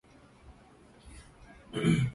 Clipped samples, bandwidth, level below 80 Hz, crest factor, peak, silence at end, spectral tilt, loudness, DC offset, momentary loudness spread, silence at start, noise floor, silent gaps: under 0.1%; 11.5 kHz; -54 dBFS; 20 dB; -14 dBFS; 0 s; -6.5 dB/octave; -31 LUFS; under 0.1%; 28 LU; 0.5 s; -57 dBFS; none